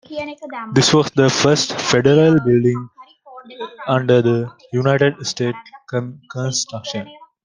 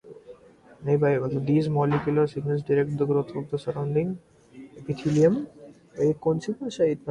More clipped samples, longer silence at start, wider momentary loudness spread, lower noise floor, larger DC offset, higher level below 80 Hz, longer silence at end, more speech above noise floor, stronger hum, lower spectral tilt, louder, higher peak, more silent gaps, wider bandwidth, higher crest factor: neither; about the same, 0.1 s vs 0.05 s; first, 16 LU vs 10 LU; second, -41 dBFS vs -52 dBFS; neither; about the same, -54 dBFS vs -58 dBFS; first, 0.2 s vs 0 s; second, 24 dB vs 28 dB; neither; second, -5 dB/octave vs -8 dB/octave; first, -17 LUFS vs -25 LUFS; first, 0 dBFS vs -8 dBFS; neither; about the same, 10 kHz vs 10 kHz; about the same, 18 dB vs 16 dB